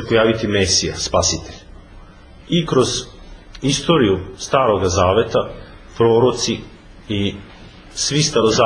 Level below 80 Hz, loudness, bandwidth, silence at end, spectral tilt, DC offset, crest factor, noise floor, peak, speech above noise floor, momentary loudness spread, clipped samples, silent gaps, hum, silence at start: -40 dBFS; -17 LUFS; 10.5 kHz; 0 s; -4 dB/octave; under 0.1%; 18 dB; -41 dBFS; 0 dBFS; 24 dB; 12 LU; under 0.1%; none; none; 0 s